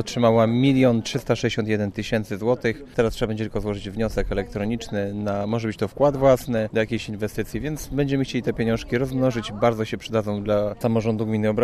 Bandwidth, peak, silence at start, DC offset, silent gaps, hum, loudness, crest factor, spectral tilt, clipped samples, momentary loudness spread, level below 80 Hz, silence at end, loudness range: 14 kHz; -6 dBFS; 0 s; under 0.1%; none; none; -23 LUFS; 16 dB; -6.5 dB/octave; under 0.1%; 9 LU; -40 dBFS; 0 s; 3 LU